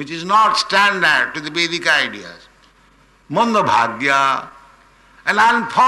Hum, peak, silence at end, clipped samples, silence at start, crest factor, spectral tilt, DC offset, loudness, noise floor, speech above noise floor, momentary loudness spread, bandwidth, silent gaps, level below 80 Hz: none; -4 dBFS; 0 s; under 0.1%; 0 s; 14 dB; -3 dB/octave; under 0.1%; -15 LUFS; -52 dBFS; 36 dB; 10 LU; 12 kHz; none; -58 dBFS